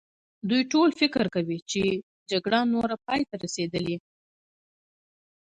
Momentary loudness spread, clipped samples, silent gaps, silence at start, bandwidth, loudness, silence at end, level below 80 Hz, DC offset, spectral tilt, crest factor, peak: 9 LU; under 0.1%; 1.62-1.66 s, 2.03-2.26 s; 0.45 s; 9.6 kHz; -26 LUFS; 1.4 s; -62 dBFS; under 0.1%; -4.5 dB/octave; 18 dB; -8 dBFS